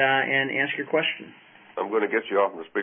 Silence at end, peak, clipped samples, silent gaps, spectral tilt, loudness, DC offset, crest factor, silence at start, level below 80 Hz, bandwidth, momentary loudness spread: 0 s; -8 dBFS; under 0.1%; none; -8.5 dB/octave; -24 LUFS; under 0.1%; 18 dB; 0 s; -78 dBFS; 3.7 kHz; 10 LU